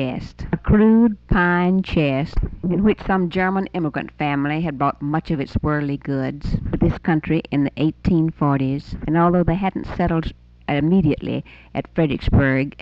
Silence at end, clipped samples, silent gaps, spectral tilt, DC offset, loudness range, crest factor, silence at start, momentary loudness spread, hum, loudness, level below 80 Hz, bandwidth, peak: 0.1 s; under 0.1%; none; -9.5 dB/octave; under 0.1%; 4 LU; 14 dB; 0 s; 9 LU; none; -20 LUFS; -32 dBFS; 6 kHz; -6 dBFS